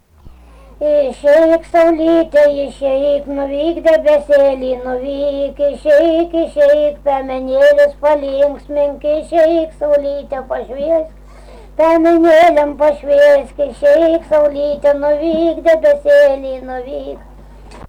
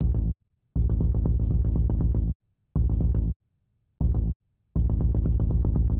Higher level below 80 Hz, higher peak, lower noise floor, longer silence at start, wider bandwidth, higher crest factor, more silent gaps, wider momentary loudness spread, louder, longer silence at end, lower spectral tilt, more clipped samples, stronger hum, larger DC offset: second, -38 dBFS vs -26 dBFS; first, -4 dBFS vs -12 dBFS; second, -40 dBFS vs -72 dBFS; first, 0.25 s vs 0 s; first, 9.8 kHz vs 1.5 kHz; about the same, 8 dB vs 12 dB; second, none vs 2.35-2.40 s, 3.36-3.40 s, 4.36-4.40 s; first, 11 LU vs 8 LU; first, -13 LUFS vs -27 LUFS; about the same, 0.05 s vs 0 s; second, -5.5 dB/octave vs -14 dB/octave; neither; neither; neither